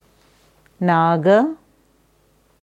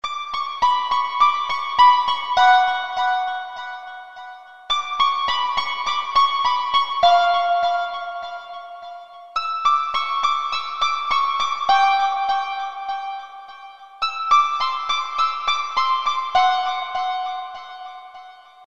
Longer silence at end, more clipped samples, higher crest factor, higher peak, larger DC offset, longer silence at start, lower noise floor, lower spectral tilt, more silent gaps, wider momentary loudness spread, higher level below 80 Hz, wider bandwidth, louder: first, 1.1 s vs 0 s; neither; about the same, 18 dB vs 18 dB; about the same, -4 dBFS vs -4 dBFS; second, under 0.1% vs 0.8%; first, 0.8 s vs 0 s; first, -59 dBFS vs -43 dBFS; first, -8 dB/octave vs 0 dB/octave; neither; second, 10 LU vs 20 LU; second, -64 dBFS vs -56 dBFS; about the same, 8 kHz vs 8.2 kHz; first, -17 LUFS vs -20 LUFS